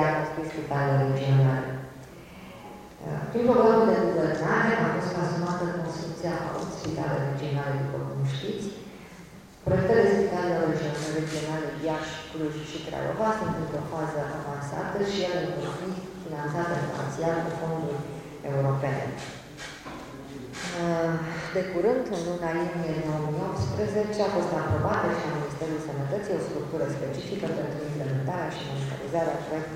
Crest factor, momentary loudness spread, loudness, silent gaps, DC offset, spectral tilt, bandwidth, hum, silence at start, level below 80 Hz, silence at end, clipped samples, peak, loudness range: 20 dB; 15 LU; -28 LUFS; none; under 0.1%; -6.5 dB/octave; 15.5 kHz; none; 0 s; -54 dBFS; 0 s; under 0.1%; -8 dBFS; 6 LU